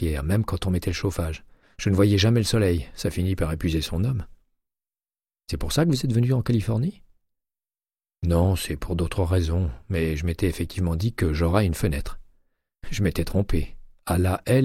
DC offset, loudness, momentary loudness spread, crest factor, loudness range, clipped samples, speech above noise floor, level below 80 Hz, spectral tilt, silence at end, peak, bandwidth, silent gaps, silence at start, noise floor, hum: under 0.1%; -24 LUFS; 10 LU; 18 dB; 3 LU; under 0.1%; over 67 dB; -34 dBFS; -6.5 dB/octave; 0 s; -6 dBFS; 16 kHz; none; 0 s; under -90 dBFS; none